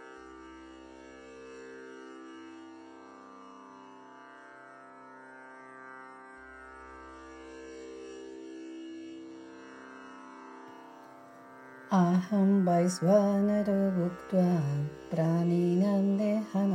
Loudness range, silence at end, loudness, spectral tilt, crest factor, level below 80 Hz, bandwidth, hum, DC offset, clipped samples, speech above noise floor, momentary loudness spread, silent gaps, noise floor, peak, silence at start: 22 LU; 0 s; -28 LUFS; -8 dB/octave; 20 dB; -68 dBFS; 11.5 kHz; none; under 0.1%; under 0.1%; 25 dB; 24 LU; none; -52 dBFS; -12 dBFS; 0 s